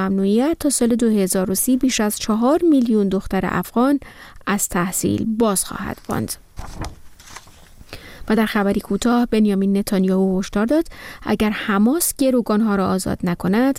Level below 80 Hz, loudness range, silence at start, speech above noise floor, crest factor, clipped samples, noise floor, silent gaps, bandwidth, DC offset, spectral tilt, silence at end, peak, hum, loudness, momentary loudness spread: -42 dBFS; 6 LU; 0 s; 25 dB; 12 dB; under 0.1%; -43 dBFS; none; 16.5 kHz; under 0.1%; -5 dB/octave; 0 s; -6 dBFS; none; -19 LUFS; 14 LU